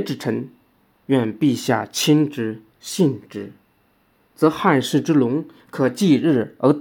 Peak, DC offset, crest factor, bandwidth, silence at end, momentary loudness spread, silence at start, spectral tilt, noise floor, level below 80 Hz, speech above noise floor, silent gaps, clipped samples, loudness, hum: -2 dBFS; under 0.1%; 18 dB; 18 kHz; 0 s; 16 LU; 0 s; -5.5 dB/octave; -61 dBFS; -68 dBFS; 42 dB; none; under 0.1%; -20 LUFS; none